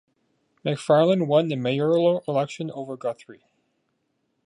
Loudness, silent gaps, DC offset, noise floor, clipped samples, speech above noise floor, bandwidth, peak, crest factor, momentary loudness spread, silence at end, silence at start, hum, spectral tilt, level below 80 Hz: -23 LUFS; none; under 0.1%; -73 dBFS; under 0.1%; 51 dB; 11 kHz; -6 dBFS; 18 dB; 13 LU; 1.15 s; 0.65 s; none; -7 dB/octave; -74 dBFS